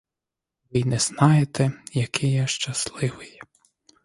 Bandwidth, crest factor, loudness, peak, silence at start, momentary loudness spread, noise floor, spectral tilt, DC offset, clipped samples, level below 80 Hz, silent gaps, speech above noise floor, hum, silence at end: 11.5 kHz; 22 dB; -23 LUFS; -2 dBFS; 0.75 s; 11 LU; -87 dBFS; -5 dB/octave; under 0.1%; under 0.1%; -56 dBFS; none; 64 dB; none; 0.75 s